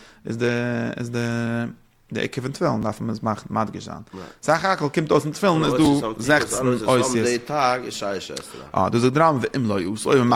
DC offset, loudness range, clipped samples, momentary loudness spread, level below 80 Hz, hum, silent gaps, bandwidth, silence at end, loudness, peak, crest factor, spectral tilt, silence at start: under 0.1%; 6 LU; under 0.1%; 11 LU; -54 dBFS; none; none; 16 kHz; 0 s; -22 LUFS; -4 dBFS; 18 dB; -5.5 dB/octave; 0 s